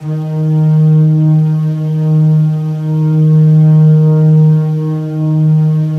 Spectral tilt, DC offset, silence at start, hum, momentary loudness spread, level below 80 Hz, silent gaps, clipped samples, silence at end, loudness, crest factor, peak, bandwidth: -11.5 dB/octave; under 0.1%; 0 s; none; 8 LU; -50 dBFS; none; under 0.1%; 0 s; -10 LUFS; 8 dB; 0 dBFS; 3.1 kHz